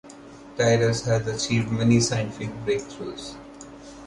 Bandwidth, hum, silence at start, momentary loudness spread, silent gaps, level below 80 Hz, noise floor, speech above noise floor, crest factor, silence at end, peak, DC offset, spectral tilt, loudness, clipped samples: 11.5 kHz; none; 0.05 s; 22 LU; none; -50 dBFS; -44 dBFS; 21 dB; 18 dB; 0 s; -6 dBFS; under 0.1%; -5 dB/octave; -24 LUFS; under 0.1%